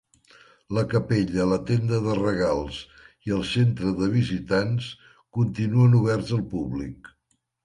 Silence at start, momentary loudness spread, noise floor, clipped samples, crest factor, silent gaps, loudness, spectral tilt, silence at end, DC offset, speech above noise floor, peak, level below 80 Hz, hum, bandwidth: 0.7 s; 13 LU; -73 dBFS; under 0.1%; 16 dB; none; -24 LUFS; -7.5 dB/octave; 0.55 s; under 0.1%; 50 dB; -10 dBFS; -48 dBFS; none; 10.5 kHz